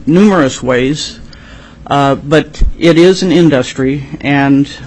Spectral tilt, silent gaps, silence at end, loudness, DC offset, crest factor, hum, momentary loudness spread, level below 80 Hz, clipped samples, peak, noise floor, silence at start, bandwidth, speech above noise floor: -6 dB/octave; none; 0 s; -10 LUFS; under 0.1%; 10 dB; none; 8 LU; -24 dBFS; 0.1%; 0 dBFS; -33 dBFS; 0 s; 10 kHz; 24 dB